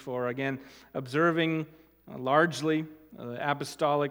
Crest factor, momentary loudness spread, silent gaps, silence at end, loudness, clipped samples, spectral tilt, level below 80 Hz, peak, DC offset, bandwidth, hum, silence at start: 20 dB; 17 LU; none; 0 s; -29 LUFS; under 0.1%; -5.5 dB/octave; -70 dBFS; -8 dBFS; under 0.1%; 16.5 kHz; none; 0 s